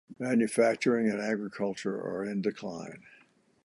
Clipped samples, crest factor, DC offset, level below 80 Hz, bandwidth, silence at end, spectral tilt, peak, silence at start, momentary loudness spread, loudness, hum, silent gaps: under 0.1%; 18 dB; under 0.1%; -76 dBFS; 11.5 kHz; 0.55 s; -5.5 dB/octave; -12 dBFS; 0.1 s; 14 LU; -30 LUFS; none; none